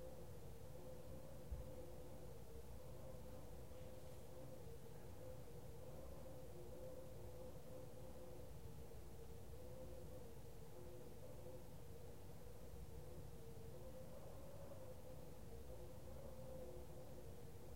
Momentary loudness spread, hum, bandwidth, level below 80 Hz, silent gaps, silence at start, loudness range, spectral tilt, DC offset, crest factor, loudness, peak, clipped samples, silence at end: 3 LU; none; 16 kHz; -64 dBFS; none; 0 s; 1 LU; -6 dB/octave; 0.2%; 18 dB; -58 LUFS; -38 dBFS; under 0.1%; 0 s